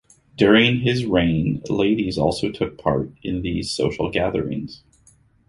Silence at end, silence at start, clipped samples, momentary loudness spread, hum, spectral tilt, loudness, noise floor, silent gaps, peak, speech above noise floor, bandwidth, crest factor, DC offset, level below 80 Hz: 0.75 s; 0.4 s; under 0.1%; 11 LU; none; -6 dB/octave; -21 LUFS; -56 dBFS; none; -2 dBFS; 36 dB; 11.5 kHz; 18 dB; under 0.1%; -42 dBFS